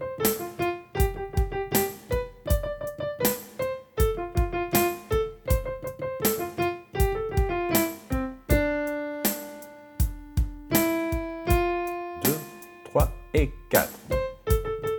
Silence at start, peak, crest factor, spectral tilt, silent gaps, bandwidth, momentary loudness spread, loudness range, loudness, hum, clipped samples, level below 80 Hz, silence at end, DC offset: 0 s; -6 dBFS; 22 dB; -5 dB/octave; none; 19 kHz; 8 LU; 1 LU; -27 LUFS; none; under 0.1%; -32 dBFS; 0 s; under 0.1%